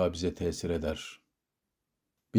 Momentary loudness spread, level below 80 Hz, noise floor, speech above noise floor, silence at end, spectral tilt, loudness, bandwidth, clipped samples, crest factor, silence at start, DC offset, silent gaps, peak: 9 LU; -54 dBFS; -86 dBFS; 53 dB; 0 s; -5.5 dB/octave; -33 LUFS; over 20 kHz; under 0.1%; 20 dB; 0 s; under 0.1%; none; -14 dBFS